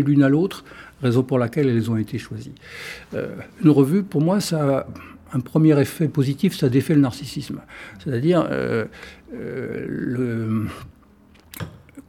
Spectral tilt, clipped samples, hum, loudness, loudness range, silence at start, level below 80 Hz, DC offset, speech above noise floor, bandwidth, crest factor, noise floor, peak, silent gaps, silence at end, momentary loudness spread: -7.5 dB/octave; under 0.1%; none; -21 LUFS; 5 LU; 0 s; -54 dBFS; under 0.1%; 31 dB; 16 kHz; 18 dB; -51 dBFS; -2 dBFS; none; 0.05 s; 19 LU